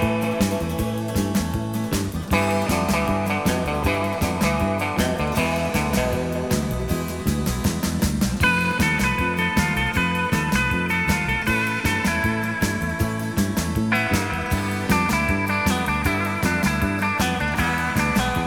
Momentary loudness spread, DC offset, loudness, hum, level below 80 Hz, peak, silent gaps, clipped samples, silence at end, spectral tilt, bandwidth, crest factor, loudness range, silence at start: 4 LU; 0.2%; -22 LUFS; none; -34 dBFS; -6 dBFS; none; under 0.1%; 0 s; -5 dB/octave; over 20 kHz; 16 dB; 2 LU; 0 s